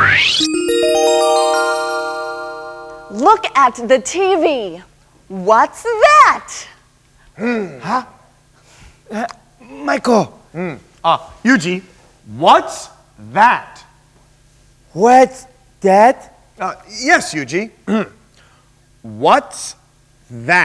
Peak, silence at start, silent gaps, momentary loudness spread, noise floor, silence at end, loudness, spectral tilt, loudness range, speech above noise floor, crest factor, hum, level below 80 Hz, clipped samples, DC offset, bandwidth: 0 dBFS; 0 s; none; 18 LU; -51 dBFS; 0 s; -14 LUFS; -3.5 dB/octave; 7 LU; 37 dB; 16 dB; none; -52 dBFS; 0.2%; under 0.1%; 11 kHz